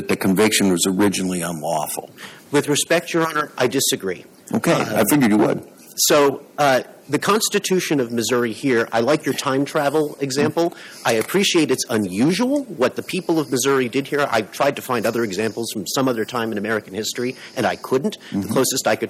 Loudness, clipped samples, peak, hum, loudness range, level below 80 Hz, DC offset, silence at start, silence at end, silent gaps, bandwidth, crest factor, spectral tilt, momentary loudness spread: -20 LUFS; under 0.1%; -4 dBFS; none; 4 LU; -62 dBFS; under 0.1%; 0 s; 0 s; none; 16.5 kHz; 14 dB; -4 dB/octave; 8 LU